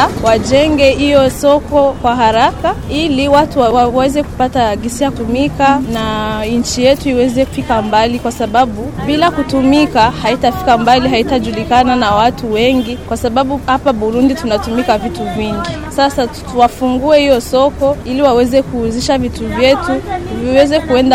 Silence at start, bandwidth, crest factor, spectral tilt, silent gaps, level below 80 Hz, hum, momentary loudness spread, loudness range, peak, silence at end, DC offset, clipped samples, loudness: 0 s; 16.5 kHz; 12 dB; -5 dB/octave; none; -30 dBFS; none; 7 LU; 3 LU; 0 dBFS; 0 s; under 0.1%; under 0.1%; -12 LUFS